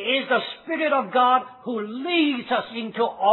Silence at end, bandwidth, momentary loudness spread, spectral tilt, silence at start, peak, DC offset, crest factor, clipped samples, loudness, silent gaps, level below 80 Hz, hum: 0 s; 4.3 kHz; 10 LU; -7 dB/octave; 0 s; -6 dBFS; under 0.1%; 16 dB; under 0.1%; -23 LUFS; none; -72 dBFS; none